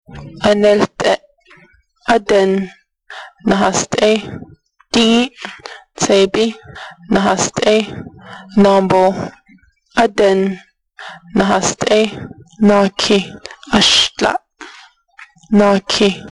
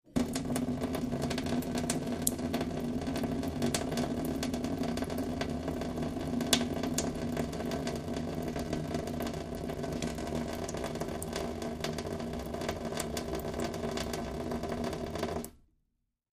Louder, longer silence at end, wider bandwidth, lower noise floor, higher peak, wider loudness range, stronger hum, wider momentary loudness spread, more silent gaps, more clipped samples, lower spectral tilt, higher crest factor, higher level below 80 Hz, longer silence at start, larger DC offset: first, -14 LUFS vs -35 LUFS; second, 0 s vs 0.8 s; second, 11.5 kHz vs 15.5 kHz; second, -50 dBFS vs -80 dBFS; first, -2 dBFS vs -6 dBFS; about the same, 3 LU vs 3 LU; neither; first, 22 LU vs 5 LU; neither; neither; about the same, -4 dB/octave vs -4.5 dB/octave; second, 14 dB vs 28 dB; about the same, -46 dBFS vs -48 dBFS; about the same, 0.1 s vs 0.05 s; neither